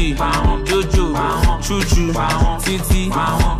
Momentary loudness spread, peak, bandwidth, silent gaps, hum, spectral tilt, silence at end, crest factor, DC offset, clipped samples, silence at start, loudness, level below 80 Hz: 1 LU; -6 dBFS; 15.5 kHz; none; none; -5 dB/octave; 0 s; 10 dB; under 0.1%; under 0.1%; 0 s; -17 LUFS; -20 dBFS